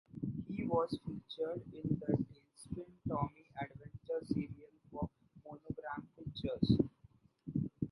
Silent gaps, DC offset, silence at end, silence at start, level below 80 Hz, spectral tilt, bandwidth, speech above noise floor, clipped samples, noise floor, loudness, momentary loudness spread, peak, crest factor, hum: none; under 0.1%; 0 s; 0.15 s; -60 dBFS; -8 dB/octave; 11.5 kHz; 28 dB; under 0.1%; -66 dBFS; -40 LUFS; 16 LU; -16 dBFS; 24 dB; none